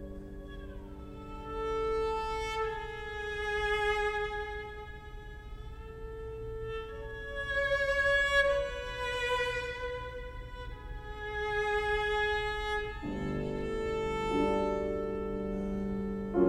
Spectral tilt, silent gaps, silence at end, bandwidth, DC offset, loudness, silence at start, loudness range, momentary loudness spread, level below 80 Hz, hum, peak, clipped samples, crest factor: -5 dB/octave; none; 0 s; 14 kHz; under 0.1%; -33 LUFS; 0 s; 6 LU; 17 LU; -44 dBFS; none; -14 dBFS; under 0.1%; 18 dB